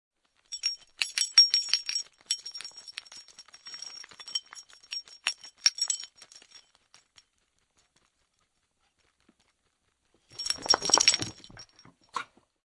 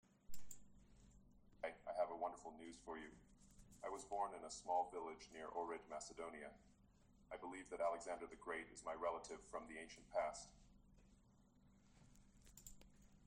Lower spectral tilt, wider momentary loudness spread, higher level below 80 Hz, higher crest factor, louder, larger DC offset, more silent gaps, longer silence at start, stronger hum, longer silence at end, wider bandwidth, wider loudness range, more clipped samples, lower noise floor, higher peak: second, 1 dB/octave vs -3.5 dB/octave; first, 26 LU vs 18 LU; about the same, -70 dBFS vs -72 dBFS; first, 30 dB vs 20 dB; first, -26 LUFS vs -49 LUFS; neither; neither; first, 0.5 s vs 0.3 s; neither; first, 0.45 s vs 0 s; first, 11.5 kHz vs 10 kHz; first, 12 LU vs 5 LU; neither; about the same, -75 dBFS vs -73 dBFS; first, -4 dBFS vs -30 dBFS